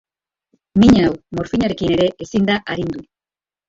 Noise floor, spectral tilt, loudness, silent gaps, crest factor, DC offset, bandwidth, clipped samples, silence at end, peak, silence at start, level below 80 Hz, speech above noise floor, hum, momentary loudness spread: under -90 dBFS; -6.5 dB/octave; -17 LUFS; none; 16 dB; under 0.1%; 7.8 kHz; under 0.1%; 0.65 s; -2 dBFS; 0.75 s; -40 dBFS; over 74 dB; none; 13 LU